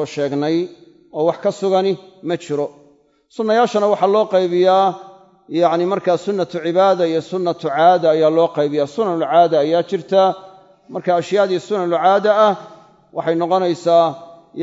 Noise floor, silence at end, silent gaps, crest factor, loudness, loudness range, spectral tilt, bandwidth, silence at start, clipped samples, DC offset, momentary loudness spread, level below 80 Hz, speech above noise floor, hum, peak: -53 dBFS; 0 s; none; 16 dB; -17 LUFS; 3 LU; -6 dB/octave; 7.8 kHz; 0 s; under 0.1%; under 0.1%; 11 LU; -70 dBFS; 37 dB; none; 0 dBFS